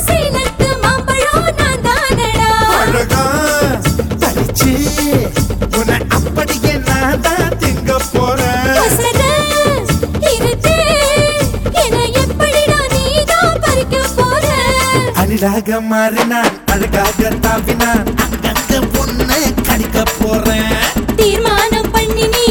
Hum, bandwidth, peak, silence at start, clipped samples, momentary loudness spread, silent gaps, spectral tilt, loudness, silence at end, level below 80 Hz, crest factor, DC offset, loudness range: none; over 20 kHz; 0 dBFS; 0 s; under 0.1%; 4 LU; none; -4 dB/octave; -13 LUFS; 0 s; -22 dBFS; 12 dB; under 0.1%; 2 LU